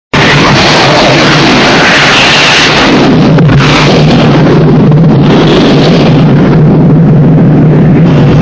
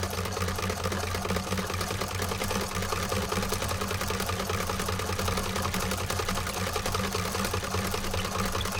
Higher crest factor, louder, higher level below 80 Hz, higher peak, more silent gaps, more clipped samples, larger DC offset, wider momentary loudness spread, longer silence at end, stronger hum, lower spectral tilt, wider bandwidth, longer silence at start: second, 4 dB vs 16 dB; first, -3 LUFS vs -30 LUFS; first, -24 dBFS vs -42 dBFS; first, 0 dBFS vs -12 dBFS; neither; first, 10% vs under 0.1%; first, 0.5% vs under 0.1%; about the same, 2 LU vs 1 LU; about the same, 0 s vs 0 s; neither; first, -5.5 dB/octave vs -3.5 dB/octave; second, 8 kHz vs 19 kHz; first, 0.15 s vs 0 s